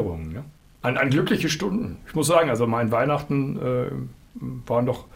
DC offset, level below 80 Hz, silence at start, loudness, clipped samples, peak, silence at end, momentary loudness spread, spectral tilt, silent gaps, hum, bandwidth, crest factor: under 0.1%; -48 dBFS; 0 s; -23 LUFS; under 0.1%; -6 dBFS; 0.1 s; 15 LU; -5.5 dB/octave; none; none; 16 kHz; 18 dB